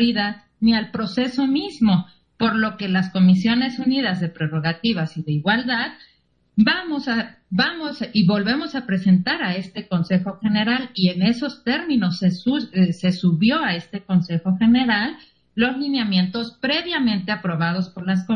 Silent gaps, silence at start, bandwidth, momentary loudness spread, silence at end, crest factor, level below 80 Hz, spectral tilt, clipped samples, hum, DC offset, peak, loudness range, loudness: none; 0 s; 6.6 kHz; 7 LU; 0 s; 16 dB; -56 dBFS; -7 dB/octave; under 0.1%; none; under 0.1%; -4 dBFS; 2 LU; -21 LUFS